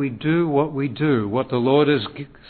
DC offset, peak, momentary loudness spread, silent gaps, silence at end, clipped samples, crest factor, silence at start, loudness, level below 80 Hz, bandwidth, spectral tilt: under 0.1%; -4 dBFS; 6 LU; none; 0.25 s; under 0.1%; 16 dB; 0 s; -20 LUFS; -56 dBFS; 4.5 kHz; -11 dB/octave